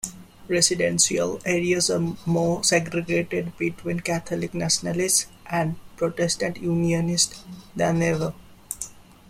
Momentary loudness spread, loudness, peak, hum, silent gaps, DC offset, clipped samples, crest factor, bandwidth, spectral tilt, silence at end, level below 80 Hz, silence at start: 10 LU; -23 LUFS; -4 dBFS; none; none; under 0.1%; under 0.1%; 20 dB; 16 kHz; -3.5 dB/octave; 0.3 s; -52 dBFS; 0.05 s